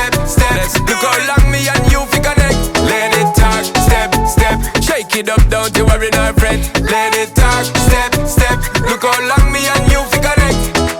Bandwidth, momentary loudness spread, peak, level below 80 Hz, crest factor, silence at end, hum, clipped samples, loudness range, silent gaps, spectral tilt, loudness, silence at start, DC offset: 20 kHz; 2 LU; 0 dBFS; -16 dBFS; 12 dB; 0 s; none; under 0.1%; 1 LU; none; -4 dB/octave; -12 LUFS; 0 s; under 0.1%